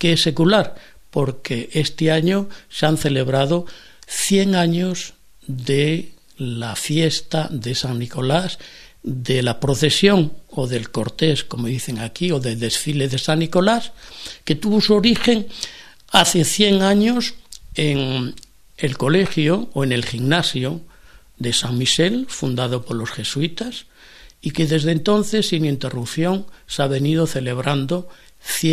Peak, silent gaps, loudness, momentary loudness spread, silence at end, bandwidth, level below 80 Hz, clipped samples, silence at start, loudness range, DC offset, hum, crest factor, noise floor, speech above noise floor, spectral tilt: 0 dBFS; none; -19 LUFS; 13 LU; 0 s; 14 kHz; -46 dBFS; under 0.1%; 0 s; 4 LU; under 0.1%; none; 20 dB; -47 dBFS; 28 dB; -4.5 dB/octave